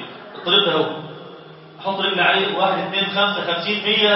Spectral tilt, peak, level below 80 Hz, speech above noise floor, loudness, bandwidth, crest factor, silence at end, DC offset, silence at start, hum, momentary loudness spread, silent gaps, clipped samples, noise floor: -7.5 dB/octave; -2 dBFS; -68 dBFS; 22 dB; -18 LUFS; 6 kHz; 18 dB; 0 s; under 0.1%; 0 s; none; 18 LU; none; under 0.1%; -40 dBFS